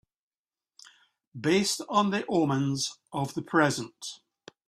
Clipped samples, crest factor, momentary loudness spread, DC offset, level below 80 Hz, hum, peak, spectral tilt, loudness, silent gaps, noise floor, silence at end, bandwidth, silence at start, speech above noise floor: under 0.1%; 22 dB; 15 LU; under 0.1%; -68 dBFS; none; -8 dBFS; -4.5 dB/octave; -27 LUFS; none; under -90 dBFS; 0.5 s; 14.5 kHz; 1.35 s; over 62 dB